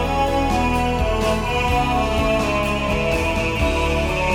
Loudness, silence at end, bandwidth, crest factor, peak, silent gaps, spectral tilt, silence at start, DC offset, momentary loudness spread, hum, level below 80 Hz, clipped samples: -20 LUFS; 0 s; 17 kHz; 14 dB; -6 dBFS; none; -5.5 dB/octave; 0 s; under 0.1%; 1 LU; none; -26 dBFS; under 0.1%